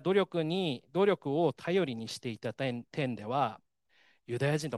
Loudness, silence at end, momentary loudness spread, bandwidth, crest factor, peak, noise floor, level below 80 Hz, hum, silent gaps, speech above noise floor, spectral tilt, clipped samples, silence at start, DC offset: -32 LUFS; 0 s; 9 LU; 12.5 kHz; 18 dB; -14 dBFS; -69 dBFS; -76 dBFS; none; none; 37 dB; -6 dB/octave; under 0.1%; 0 s; under 0.1%